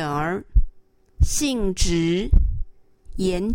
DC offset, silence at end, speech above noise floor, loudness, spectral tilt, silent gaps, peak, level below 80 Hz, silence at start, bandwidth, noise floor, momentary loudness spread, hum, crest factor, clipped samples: under 0.1%; 0 s; 30 dB; -23 LUFS; -5 dB/octave; none; -4 dBFS; -24 dBFS; 0 s; 16.5 kHz; -50 dBFS; 15 LU; none; 18 dB; under 0.1%